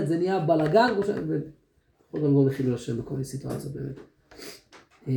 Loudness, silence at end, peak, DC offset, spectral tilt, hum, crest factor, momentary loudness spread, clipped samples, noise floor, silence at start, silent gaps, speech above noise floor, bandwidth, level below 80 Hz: -26 LUFS; 0 s; -8 dBFS; under 0.1%; -7.5 dB/octave; none; 20 dB; 21 LU; under 0.1%; -65 dBFS; 0 s; none; 40 dB; 20 kHz; -58 dBFS